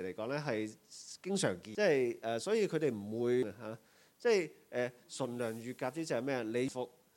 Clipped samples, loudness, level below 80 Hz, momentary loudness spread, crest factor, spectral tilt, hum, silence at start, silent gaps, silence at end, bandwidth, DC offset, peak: under 0.1%; -36 LUFS; -82 dBFS; 12 LU; 18 dB; -5 dB/octave; none; 0 s; none; 0.3 s; 17 kHz; under 0.1%; -18 dBFS